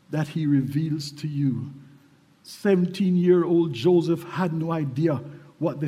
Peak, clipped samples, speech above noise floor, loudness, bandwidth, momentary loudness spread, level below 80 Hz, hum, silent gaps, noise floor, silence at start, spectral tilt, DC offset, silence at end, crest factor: -8 dBFS; under 0.1%; 33 dB; -24 LUFS; 14 kHz; 11 LU; -66 dBFS; none; none; -56 dBFS; 0.1 s; -8 dB/octave; under 0.1%; 0 s; 16 dB